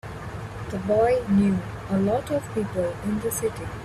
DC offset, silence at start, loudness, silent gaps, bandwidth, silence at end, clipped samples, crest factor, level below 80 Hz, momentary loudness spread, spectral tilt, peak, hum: under 0.1%; 0.05 s; -25 LUFS; none; 14.5 kHz; 0 s; under 0.1%; 14 dB; -46 dBFS; 13 LU; -6.5 dB/octave; -10 dBFS; none